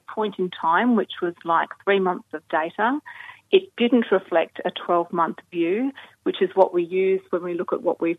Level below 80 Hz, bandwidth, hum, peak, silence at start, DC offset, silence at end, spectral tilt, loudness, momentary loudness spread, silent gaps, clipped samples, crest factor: -76 dBFS; 4 kHz; none; -2 dBFS; 0.1 s; under 0.1%; 0 s; -7.5 dB/octave; -23 LUFS; 9 LU; none; under 0.1%; 20 dB